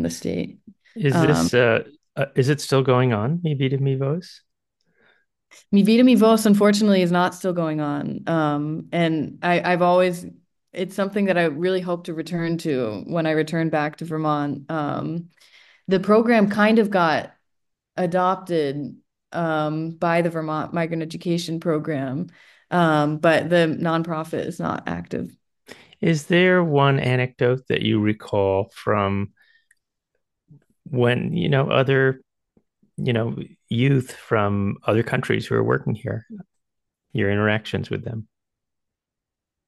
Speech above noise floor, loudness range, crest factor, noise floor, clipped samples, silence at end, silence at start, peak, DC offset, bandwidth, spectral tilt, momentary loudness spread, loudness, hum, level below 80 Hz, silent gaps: 65 dB; 6 LU; 18 dB; -86 dBFS; under 0.1%; 1.45 s; 0 s; -4 dBFS; under 0.1%; 12.5 kHz; -6.5 dB/octave; 12 LU; -21 LUFS; none; -60 dBFS; none